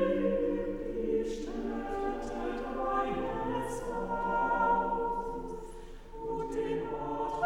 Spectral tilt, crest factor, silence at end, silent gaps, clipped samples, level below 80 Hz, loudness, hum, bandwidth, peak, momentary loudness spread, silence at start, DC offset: -6.5 dB/octave; 16 dB; 0 s; none; under 0.1%; -46 dBFS; -33 LUFS; none; 16 kHz; -16 dBFS; 10 LU; 0 s; under 0.1%